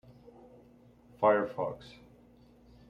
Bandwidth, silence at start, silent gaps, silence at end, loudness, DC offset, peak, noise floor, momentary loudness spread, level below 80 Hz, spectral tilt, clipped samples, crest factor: 7 kHz; 1.2 s; none; 1 s; -30 LUFS; under 0.1%; -14 dBFS; -59 dBFS; 22 LU; -66 dBFS; -7.5 dB/octave; under 0.1%; 22 dB